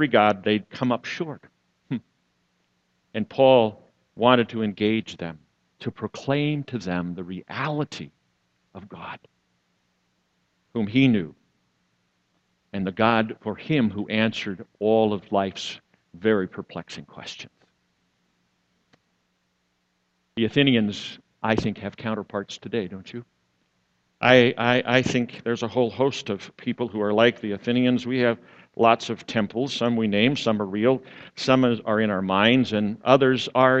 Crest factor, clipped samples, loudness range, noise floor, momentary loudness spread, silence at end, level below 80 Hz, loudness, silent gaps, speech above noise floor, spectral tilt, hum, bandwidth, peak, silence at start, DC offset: 24 dB; under 0.1%; 10 LU; -72 dBFS; 17 LU; 0 s; -60 dBFS; -23 LUFS; none; 49 dB; -6 dB/octave; none; 8.2 kHz; 0 dBFS; 0 s; under 0.1%